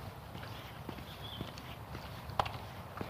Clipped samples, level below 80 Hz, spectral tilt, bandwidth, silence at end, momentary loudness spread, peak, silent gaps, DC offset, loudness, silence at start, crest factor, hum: under 0.1%; -56 dBFS; -5 dB/octave; 15.5 kHz; 0 s; 9 LU; -16 dBFS; none; under 0.1%; -43 LUFS; 0 s; 28 dB; none